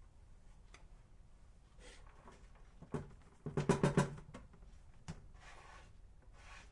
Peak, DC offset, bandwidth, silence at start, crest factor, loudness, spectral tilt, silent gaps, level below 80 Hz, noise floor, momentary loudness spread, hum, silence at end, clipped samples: -18 dBFS; under 0.1%; 11.5 kHz; 0 s; 26 dB; -40 LUFS; -6.5 dB/octave; none; -58 dBFS; -61 dBFS; 28 LU; none; 0 s; under 0.1%